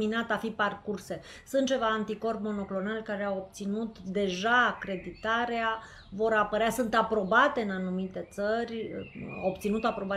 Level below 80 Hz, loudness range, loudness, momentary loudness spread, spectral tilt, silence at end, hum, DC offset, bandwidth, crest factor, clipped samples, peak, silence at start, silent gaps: -58 dBFS; 4 LU; -30 LUFS; 12 LU; -5 dB/octave; 0 s; none; under 0.1%; 15 kHz; 20 dB; under 0.1%; -10 dBFS; 0 s; none